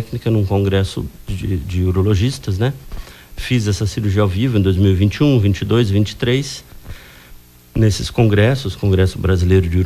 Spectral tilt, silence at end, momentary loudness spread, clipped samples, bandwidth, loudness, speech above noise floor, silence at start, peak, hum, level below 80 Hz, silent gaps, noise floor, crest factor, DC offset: -7 dB/octave; 0 s; 15 LU; under 0.1%; 14 kHz; -17 LUFS; 26 dB; 0 s; -2 dBFS; none; -28 dBFS; none; -41 dBFS; 14 dB; under 0.1%